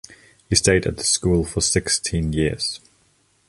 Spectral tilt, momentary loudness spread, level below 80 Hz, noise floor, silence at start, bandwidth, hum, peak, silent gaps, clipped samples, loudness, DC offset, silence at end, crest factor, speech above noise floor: -3.5 dB/octave; 7 LU; -36 dBFS; -61 dBFS; 0.1 s; 11.5 kHz; none; -2 dBFS; none; under 0.1%; -20 LUFS; under 0.1%; 0.7 s; 20 dB; 41 dB